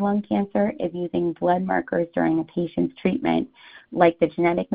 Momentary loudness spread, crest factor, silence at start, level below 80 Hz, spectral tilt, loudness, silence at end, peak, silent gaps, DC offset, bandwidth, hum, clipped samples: 6 LU; 22 dB; 0 s; -56 dBFS; -6 dB/octave; -23 LUFS; 0 s; -2 dBFS; none; under 0.1%; 4.9 kHz; none; under 0.1%